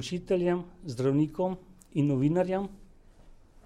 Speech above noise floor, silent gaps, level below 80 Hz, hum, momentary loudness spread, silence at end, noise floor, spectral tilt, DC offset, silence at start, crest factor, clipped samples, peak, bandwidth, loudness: 25 dB; none; -54 dBFS; none; 11 LU; 0.3 s; -54 dBFS; -7.5 dB/octave; under 0.1%; 0 s; 14 dB; under 0.1%; -16 dBFS; 11.5 kHz; -29 LUFS